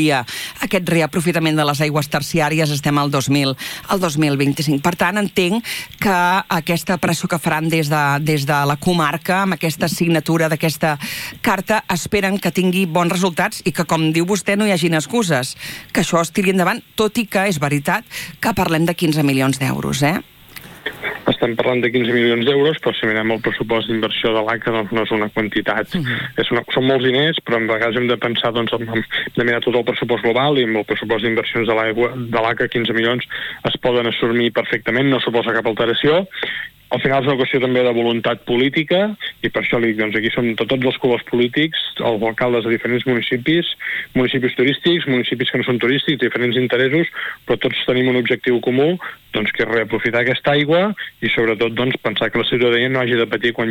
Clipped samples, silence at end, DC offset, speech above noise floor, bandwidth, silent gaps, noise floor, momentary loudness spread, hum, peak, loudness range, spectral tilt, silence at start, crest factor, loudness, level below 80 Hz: under 0.1%; 0 s; under 0.1%; 21 dB; 18 kHz; none; -38 dBFS; 5 LU; none; -2 dBFS; 1 LU; -5 dB/octave; 0 s; 16 dB; -17 LUFS; -50 dBFS